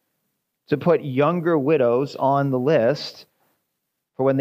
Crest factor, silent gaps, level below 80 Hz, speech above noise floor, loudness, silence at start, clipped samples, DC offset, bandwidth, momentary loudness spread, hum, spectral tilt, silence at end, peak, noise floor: 16 dB; none; -72 dBFS; 58 dB; -20 LUFS; 0.7 s; under 0.1%; under 0.1%; 15.5 kHz; 6 LU; none; -8 dB/octave; 0 s; -6 dBFS; -78 dBFS